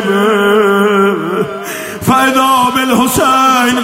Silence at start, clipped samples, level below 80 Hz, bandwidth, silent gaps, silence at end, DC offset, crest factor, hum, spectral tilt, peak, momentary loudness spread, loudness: 0 s; under 0.1%; -46 dBFS; 16.5 kHz; none; 0 s; under 0.1%; 10 dB; none; -4 dB/octave; 0 dBFS; 8 LU; -10 LUFS